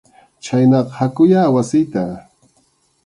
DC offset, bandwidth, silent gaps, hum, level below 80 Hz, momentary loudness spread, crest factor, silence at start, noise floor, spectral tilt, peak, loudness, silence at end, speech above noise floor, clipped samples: under 0.1%; 11 kHz; none; none; -56 dBFS; 14 LU; 14 dB; 0.45 s; -60 dBFS; -7.5 dB/octave; -2 dBFS; -15 LUFS; 0.85 s; 45 dB; under 0.1%